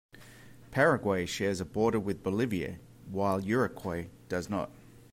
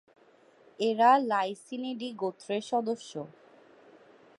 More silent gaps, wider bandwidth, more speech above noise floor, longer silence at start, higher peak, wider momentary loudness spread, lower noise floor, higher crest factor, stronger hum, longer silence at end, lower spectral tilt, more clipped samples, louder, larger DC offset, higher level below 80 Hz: neither; first, 16 kHz vs 11.5 kHz; second, 22 dB vs 32 dB; second, 0.15 s vs 0.8 s; second, -14 dBFS vs -10 dBFS; second, 13 LU vs 16 LU; second, -53 dBFS vs -61 dBFS; about the same, 18 dB vs 20 dB; neither; second, 0.35 s vs 1.1 s; first, -6 dB/octave vs -4.5 dB/octave; neither; about the same, -31 LUFS vs -29 LUFS; neither; first, -60 dBFS vs -86 dBFS